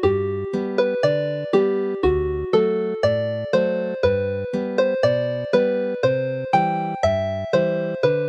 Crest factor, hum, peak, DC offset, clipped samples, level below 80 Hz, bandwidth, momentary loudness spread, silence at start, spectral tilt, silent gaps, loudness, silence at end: 16 dB; none; -4 dBFS; under 0.1%; under 0.1%; -42 dBFS; 8.2 kHz; 4 LU; 0 s; -7 dB/octave; none; -21 LUFS; 0 s